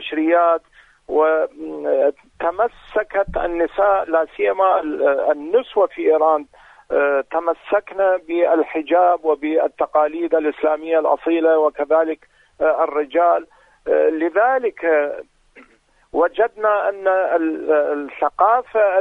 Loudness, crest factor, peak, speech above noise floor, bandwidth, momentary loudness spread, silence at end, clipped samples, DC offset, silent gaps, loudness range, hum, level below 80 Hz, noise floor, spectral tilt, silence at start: -18 LUFS; 16 dB; -2 dBFS; 37 dB; 4 kHz; 6 LU; 0 s; under 0.1%; under 0.1%; none; 2 LU; none; -50 dBFS; -55 dBFS; -6.5 dB/octave; 0 s